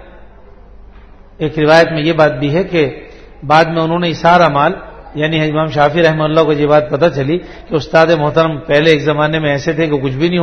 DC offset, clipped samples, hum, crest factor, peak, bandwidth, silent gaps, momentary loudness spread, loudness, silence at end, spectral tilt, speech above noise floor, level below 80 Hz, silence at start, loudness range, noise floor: under 0.1%; 0.3%; none; 12 dB; 0 dBFS; 9.8 kHz; none; 10 LU; -12 LUFS; 0 s; -6.5 dB/octave; 25 dB; -38 dBFS; 0 s; 2 LU; -37 dBFS